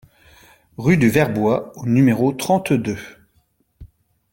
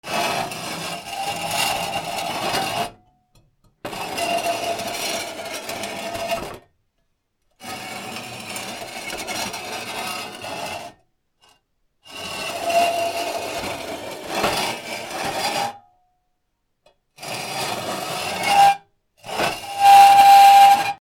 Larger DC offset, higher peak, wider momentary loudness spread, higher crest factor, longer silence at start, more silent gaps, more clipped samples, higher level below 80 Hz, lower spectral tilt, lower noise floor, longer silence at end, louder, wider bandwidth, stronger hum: neither; about the same, -2 dBFS vs 0 dBFS; second, 10 LU vs 19 LU; about the same, 18 dB vs 20 dB; first, 0.8 s vs 0.05 s; neither; neither; first, -52 dBFS vs -58 dBFS; first, -7 dB/octave vs -2 dB/octave; second, -63 dBFS vs -72 dBFS; first, 0.45 s vs 0.05 s; about the same, -18 LUFS vs -19 LUFS; about the same, 17 kHz vs 18.5 kHz; neither